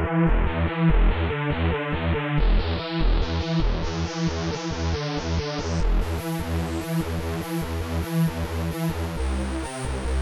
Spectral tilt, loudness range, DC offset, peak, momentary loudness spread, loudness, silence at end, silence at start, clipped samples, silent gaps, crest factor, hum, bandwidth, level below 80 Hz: -6 dB/octave; 3 LU; under 0.1%; -8 dBFS; 6 LU; -26 LUFS; 0 s; 0 s; under 0.1%; none; 16 dB; none; 13 kHz; -28 dBFS